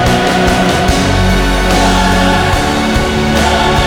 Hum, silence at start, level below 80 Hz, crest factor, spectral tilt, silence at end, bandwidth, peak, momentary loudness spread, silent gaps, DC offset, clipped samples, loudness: none; 0 s; -18 dBFS; 10 dB; -4.5 dB/octave; 0 s; 19 kHz; 0 dBFS; 2 LU; none; under 0.1%; under 0.1%; -11 LUFS